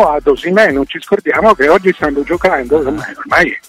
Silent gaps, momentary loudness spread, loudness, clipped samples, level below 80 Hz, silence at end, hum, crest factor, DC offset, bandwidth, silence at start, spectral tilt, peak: none; 7 LU; -12 LUFS; under 0.1%; -36 dBFS; 0.1 s; none; 12 dB; under 0.1%; 15.5 kHz; 0 s; -5.5 dB/octave; 0 dBFS